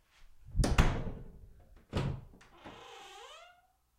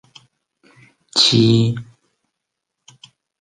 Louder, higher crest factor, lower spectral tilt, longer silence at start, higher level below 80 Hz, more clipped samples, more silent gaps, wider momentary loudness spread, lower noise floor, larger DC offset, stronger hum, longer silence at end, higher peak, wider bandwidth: second, -35 LUFS vs -14 LUFS; first, 26 dB vs 20 dB; about the same, -5.5 dB/octave vs -5 dB/octave; second, 0.5 s vs 1.15 s; first, -38 dBFS vs -54 dBFS; neither; neither; first, 24 LU vs 11 LU; second, -67 dBFS vs -79 dBFS; neither; neither; second, 0.6 s vs 1.6 s; second, -10 dBFS vs -2 dBFS; first, 16 kHz vs 9.6 kHz